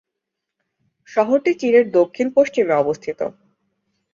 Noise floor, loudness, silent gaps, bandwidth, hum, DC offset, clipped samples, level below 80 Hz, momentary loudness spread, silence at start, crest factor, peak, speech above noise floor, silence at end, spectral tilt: -81 dBFS; -18 LUFS; none; 7.4 kHz; none; under 0.1%; under 0.1%; -66 dBFS; 11 LU; 1.1 s; 16 dB; -2 dBFS; 64 dB; 0.85 s; -6 dB/octave